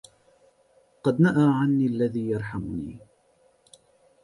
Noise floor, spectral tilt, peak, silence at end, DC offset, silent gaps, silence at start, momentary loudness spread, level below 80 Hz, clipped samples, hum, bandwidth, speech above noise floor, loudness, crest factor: -63 dBFS; -8.5 dB/octave; -8 dBFS; 1.25 s; under 0.1%; none; 1.05 s; 14 LU; -56 dBFS; under 0.1%; none; 11.5 kHz; 40 dB; -24 LUFS; 18 dB